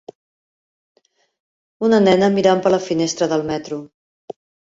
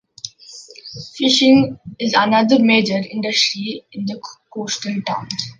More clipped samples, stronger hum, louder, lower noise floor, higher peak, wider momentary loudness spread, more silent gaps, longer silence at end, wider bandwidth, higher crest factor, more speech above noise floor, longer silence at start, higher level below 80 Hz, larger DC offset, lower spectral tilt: neither; neither; about the same, -17 LUFS vs -17 LUFS; first, under -90 dBFS vs -41 dBFS; about the same, -2 dBFS vs -2 dBFS; about the same, 21 LU vs 20 LU; neither; first, 0.85 s vs 0.05 s; second, 8 kHz vs 9.6 kHz; about the same, 18 dB vs 16 dB; first, over 74 dB vs 24 dB; first, 1.8 s vs 0.25 s; about the same, -58 dBFS vs -60 dBFS; neither; first, -5.5 dB/octave vs -4 dB/octave